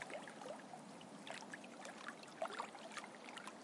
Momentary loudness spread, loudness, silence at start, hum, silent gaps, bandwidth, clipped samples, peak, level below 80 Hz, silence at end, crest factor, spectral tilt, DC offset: 7 LU; -51 LUFS; 0 s; none; none; 11.5 kHz; under 0.1%; -32 dBFS; under -90 dBFS; 0 s; 20 dB; -3 dB/octave; under 0.1%